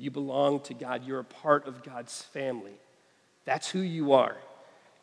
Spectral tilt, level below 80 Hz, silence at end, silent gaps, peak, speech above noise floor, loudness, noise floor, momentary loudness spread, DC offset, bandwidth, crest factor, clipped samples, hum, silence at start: -5 dB/octave; under -90 dBFS; 0.45 s; none; -8 dBFS; 36 dB; -30 LUFS; -65 dBFS; 17 LU; under 0.1%; 11 kHz; 24 dB; under 0.1%; none; 0 s